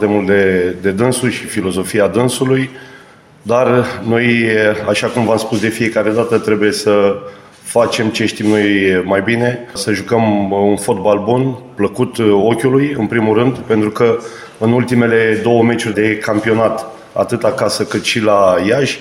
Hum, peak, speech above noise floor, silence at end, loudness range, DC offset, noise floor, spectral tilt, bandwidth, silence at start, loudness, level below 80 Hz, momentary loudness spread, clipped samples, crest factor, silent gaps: none; 0 dBFS; 28 dB; 0 s; 1 LU; under 0.1%; -41 dBFS; -5.5 dB/octave; 16 kHz; 0 s; -14 LUFS; -52 dBFS; 6 LU; under 0.1%; 14 dB; none